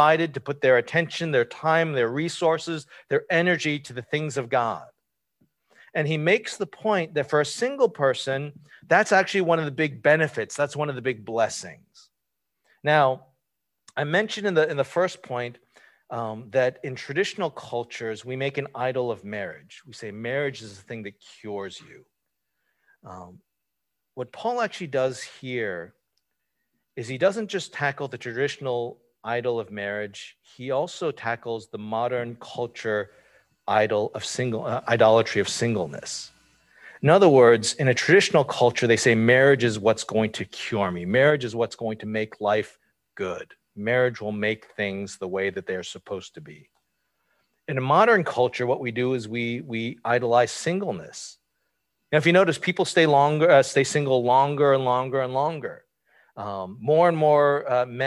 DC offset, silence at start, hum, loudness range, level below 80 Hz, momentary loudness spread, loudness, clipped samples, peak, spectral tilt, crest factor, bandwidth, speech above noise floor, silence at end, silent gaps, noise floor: under 0.1%; 0 s; none; 11 LU; -64 dBFS; 17 LU; -23 LUFS; under 0.1%; -4 dBFS; -5 dB/octave; 20 dB; 12 kHz; 59 dB; 0 s; none; -82 dBFS